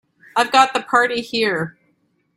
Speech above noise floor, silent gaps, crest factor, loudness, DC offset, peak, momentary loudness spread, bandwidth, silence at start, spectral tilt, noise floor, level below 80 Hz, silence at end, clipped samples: 47 dB; none; 20 dB; -18 LUFS; under 0.1%; 0 dBFS; 10 LU; 15 kHz; 0.35 s; -3 dB/octave; -64 dBFS; -64 dBFS; 0.65 s; under 0.1%